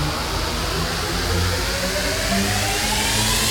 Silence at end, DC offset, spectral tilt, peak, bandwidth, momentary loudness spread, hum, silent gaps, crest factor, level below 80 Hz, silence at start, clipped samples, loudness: 0 s; under 0.1%; -3 dB/octave; -6 dBFS; 19.5 kHz; 5 LU; none; none; 14 dB; -30 dBFS; 0 s; under 0.1%; -20 LUFS